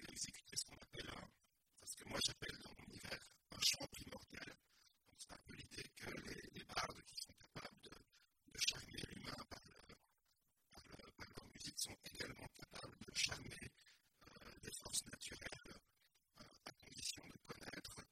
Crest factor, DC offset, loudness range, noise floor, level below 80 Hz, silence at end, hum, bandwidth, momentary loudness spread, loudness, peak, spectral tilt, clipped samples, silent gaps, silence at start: 28 dB; under 0.1%; 8 LU; -84 dBFS; -70 dBFS; 0.05 s; none; 16.5 kHz; 20 LU; -48 LUFS; -24 dBFS; -1.5 dB/octave; under 0.1%; none; 0 s